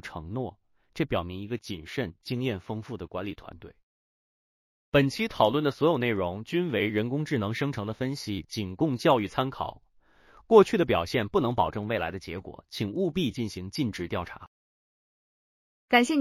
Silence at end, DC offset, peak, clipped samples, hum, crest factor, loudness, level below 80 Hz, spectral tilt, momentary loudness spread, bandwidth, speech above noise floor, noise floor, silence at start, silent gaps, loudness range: 0 s; under 0.1%; -4 dBFS; under 0.1%; none; 24 dB; -28 LUFS; -56 dBFS; -6 dB/octave; 13 LU; 15.5 kHz; 32 dB; -59 dBFS; 0.05 s; 3.83-4.92 s, 14.47-15.88 s; 8 LU